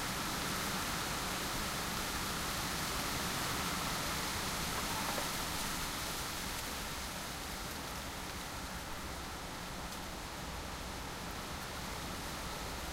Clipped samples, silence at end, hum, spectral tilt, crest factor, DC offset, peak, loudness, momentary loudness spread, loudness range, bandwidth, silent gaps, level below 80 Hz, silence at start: under 0.1%; 0 s; none; -2.5 dB/octave; 18 dB; under 0.1%; -22 dBFS; -38 LUFS; 7 LU; 7 LU; 16 kHz; none; -50 dBFS; 0 s